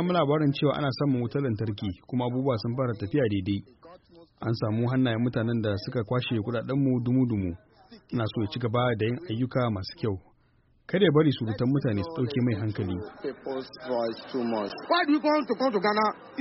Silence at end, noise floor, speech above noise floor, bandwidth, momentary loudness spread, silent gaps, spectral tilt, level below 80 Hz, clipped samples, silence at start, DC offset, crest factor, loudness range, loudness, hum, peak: 0 s; -64 dBFS; 37 dB; 6 kHz; 9 LU; none; -6 dB/octave; -60 dBFS; under 0.1%; 0 s; under 0.1%; 18 dB; 3 LU; -28 LUFS; none; -10 dBFS